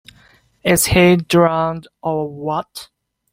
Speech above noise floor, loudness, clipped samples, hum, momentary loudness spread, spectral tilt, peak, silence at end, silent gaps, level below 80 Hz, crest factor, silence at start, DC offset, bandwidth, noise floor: 36 dB; -16 LUFS; under 0.1%; none; 13 LU; -4.5 dB/octave; -2 dBFS; 0.5 s; none; -42 dBFS; 16 dB; 0.65 s; under 0.1%; 16.5 kHz; -52 dBFS